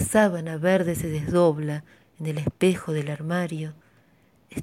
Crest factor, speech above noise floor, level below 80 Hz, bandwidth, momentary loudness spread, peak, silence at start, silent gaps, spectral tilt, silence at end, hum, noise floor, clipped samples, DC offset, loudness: 18 dB; 36 dB; -52 dBFS; 16.5 kHz; 13 LU; -8 dBFS; 0 s; none; -6 dB/octave; 0 s; none; -60 dBFS; under 0.1%; under 0.1%; -25 LUFS